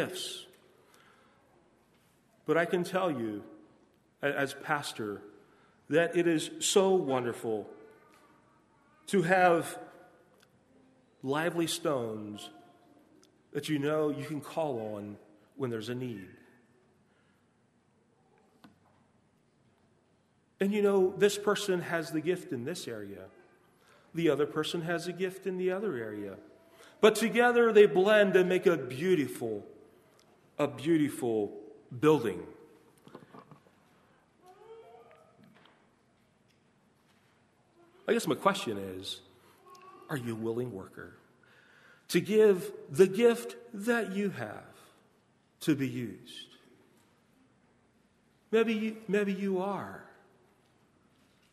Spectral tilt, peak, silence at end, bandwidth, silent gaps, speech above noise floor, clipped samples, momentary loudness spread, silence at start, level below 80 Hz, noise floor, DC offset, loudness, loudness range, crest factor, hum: -5 dB/octave; -8 dBFS; 1.5 s; 13.5 kHz; none; 40 dB; under 0.1%; 21 LU; 0 s; -78 dBFS; -69 dBFS; under 0.1%; -30 LUFS; 12 LU; 24 dB; none